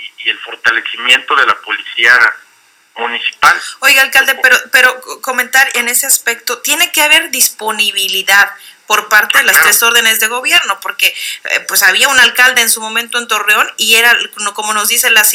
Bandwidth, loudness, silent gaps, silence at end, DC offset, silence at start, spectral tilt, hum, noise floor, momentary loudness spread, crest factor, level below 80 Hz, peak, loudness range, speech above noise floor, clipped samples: over 20 kHz; -9 LUFS; none; 0 s; under 0.1%; 0 s; 2 dB/octave; none; -48 dBFS; 10 LU; 12 dB; -56 dBFS; 0 dBFS; 2 LU; 37 dB; 2%